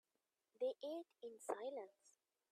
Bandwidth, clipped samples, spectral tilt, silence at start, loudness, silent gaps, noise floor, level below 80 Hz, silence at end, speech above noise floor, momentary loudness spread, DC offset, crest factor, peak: 13.5 kHz; under 0.1%; -2.5 dB/octave; 0.6 s; -49 LUFS; none; under -90 dBFS; under -90 dBFS; 0.45 s; over 40 dB; 10 LU; under 0.1%; 22 dB; -28 dBFS